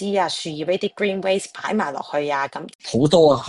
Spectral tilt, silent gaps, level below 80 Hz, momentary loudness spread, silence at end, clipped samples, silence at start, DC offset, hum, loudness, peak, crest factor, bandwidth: -5 dB/octave; 2.75-2.79 s; -54 dBFS; 10 LU; 0 s; under 0.1%; 0 s; under 0.1%; none; -21 LUFS; -2 dBFS; 18 dB; 11.5 kHz